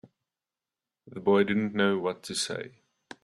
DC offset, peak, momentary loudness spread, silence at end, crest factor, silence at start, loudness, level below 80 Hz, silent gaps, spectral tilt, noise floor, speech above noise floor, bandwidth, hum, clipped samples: under 0.1%; -10 dBFS; 15 LU; 0.55 s; 20 dB; 1.05 s; -28 LUFS; -70 dBFS; none; -4.5 dB/octave; under -90 dBFS; over 63 dB; 13 kHz; none; under 0.1%